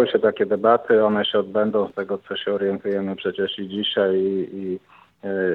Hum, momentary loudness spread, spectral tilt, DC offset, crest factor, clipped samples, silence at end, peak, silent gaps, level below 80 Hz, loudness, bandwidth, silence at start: none; 11 LU; -8 dB/octave; under 0.1%; 18 dB; under 0.1%; 0 s; -2 dBFS; none; -68 dBFS; -22 LUFS; 4.3 kHz; 0 s